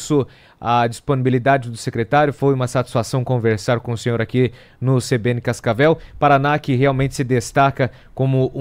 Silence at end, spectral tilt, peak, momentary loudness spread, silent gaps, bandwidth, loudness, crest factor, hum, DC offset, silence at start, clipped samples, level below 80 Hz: 0 s; -6.5 dB/octave; -4 dBFS; 6 LU; none; 15 kHz; -18 LUFS; 14 dB; none; under 0.1%; 0 s; under 0.1%; -46 dBFS